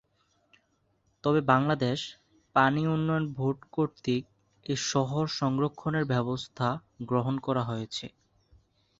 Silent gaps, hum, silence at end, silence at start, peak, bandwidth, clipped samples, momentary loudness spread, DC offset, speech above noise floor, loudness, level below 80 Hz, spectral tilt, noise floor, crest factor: none; none; 0.9 s; 1.25 s; -8 dBFS; 8 kHz; under 0.1%; 10 LU; under 0.1%; 44 dB; -29 LUFS; -62 dBFS; -6 dB/octave; -72 dBFS; 22 dB